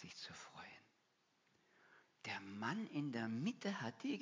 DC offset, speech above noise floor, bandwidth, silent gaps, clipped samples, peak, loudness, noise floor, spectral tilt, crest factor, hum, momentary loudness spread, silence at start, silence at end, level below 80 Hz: under 0.1%; 36 dB; 7.6 kHz; none; under 0.1%; -28 dBFS; -46 LUFS; -80 dBFS; -5.5 dB/octave; 20 dB; none; 13 LU; 0 s; 0 s; -86 dBFS